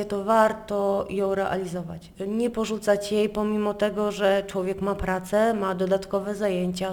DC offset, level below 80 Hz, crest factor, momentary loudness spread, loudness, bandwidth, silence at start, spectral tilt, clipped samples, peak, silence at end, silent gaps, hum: under 0.1%; -48 dBFS; 18 dB; 6 LU; -25 LUFS; over 20 kHz; 0 s; -5.5 dB/octave; under 0.1%; -6 dBFS; 0 s; none; none